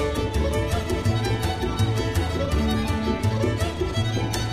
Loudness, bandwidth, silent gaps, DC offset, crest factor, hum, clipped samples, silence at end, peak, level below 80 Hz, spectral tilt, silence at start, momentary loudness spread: -24 LUFS; 15.5 kHz; none; under 0.1%; 14 dB; none; under 0.1%; 0 s; -10 dBFS; -32 dBFS; -6 dB/octave; 0 s; 2 LU